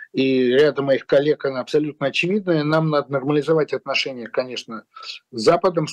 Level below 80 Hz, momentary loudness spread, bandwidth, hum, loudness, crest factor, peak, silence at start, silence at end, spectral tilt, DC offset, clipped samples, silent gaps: -64 dBFS; 13 LU; 10 kHz; none; -20 LUFS; 12 dB; -8 dBFS; 0 s; 0 s; -6 dB/octave; under 0.1%; under 0.1%; none